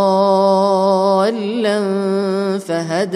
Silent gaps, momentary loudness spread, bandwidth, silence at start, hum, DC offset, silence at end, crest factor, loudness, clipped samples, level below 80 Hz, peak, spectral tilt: none; 6 LU; 12.5 kHz; 0 s; none; under 0.1%; 0 s; 12 dB; -16 LUFS; under 0.1%; -68 dBFS; -4 dBFS; -6 dB/octave